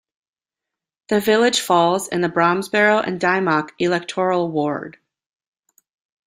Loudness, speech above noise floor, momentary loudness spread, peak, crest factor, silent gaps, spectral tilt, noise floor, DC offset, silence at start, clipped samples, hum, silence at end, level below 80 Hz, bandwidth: -18 LUFS; 68 dB; 7 LU; -2 dBFS; 18 dB; none; -4 dB/octave; -86 dBFS; under 0.1%; 1.1 s; under 0.1%; none; 1.35 s; -64 dBFS; 16 kHz